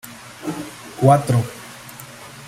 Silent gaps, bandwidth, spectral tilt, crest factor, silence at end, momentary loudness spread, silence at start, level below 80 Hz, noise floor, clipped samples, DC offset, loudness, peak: none; 16 kHz; -6.5 dB/octave; 20 dB; 0 s; 21 LU; 0.05 s; -54 dBFS; -38 dBFS; under 0.1%; under 0.1%; -19 LUFS; -2 dBFS